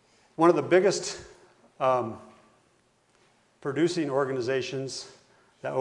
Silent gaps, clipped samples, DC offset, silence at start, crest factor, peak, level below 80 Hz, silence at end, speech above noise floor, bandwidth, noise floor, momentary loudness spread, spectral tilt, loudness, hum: none; under 0.1%; under 0.1%; 0.4 s; 22 dB; -6 dBFS; -70 dBFS; 0 s; 41 dB; 11 kHz; -66 dBFS; 17 LU; -5 dB/octave; -27 LUFS; none